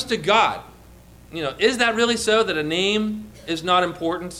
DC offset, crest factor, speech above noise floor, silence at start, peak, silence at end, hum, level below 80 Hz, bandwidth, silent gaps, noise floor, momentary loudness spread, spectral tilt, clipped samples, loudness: under 0.1%; 16 dB; 25 dB; 0 s; -6 dBFS; 0 s; none; -50 dBFS; 15.5 kHz; none; -46 dBFS; 11 LU; -3.5 dB/octave; under 0.1%; -20 LUFS